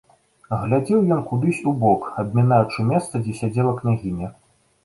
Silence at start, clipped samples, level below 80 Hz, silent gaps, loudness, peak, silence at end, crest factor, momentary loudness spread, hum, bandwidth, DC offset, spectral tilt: 0.5 s; under 0.1%; -50 dBFS; none; -21 LUFS; -2 dBFS; 0.55 s; 18 dB; 9 LU; none; 11.5 kHz; under 0.1%; -8 dB/octave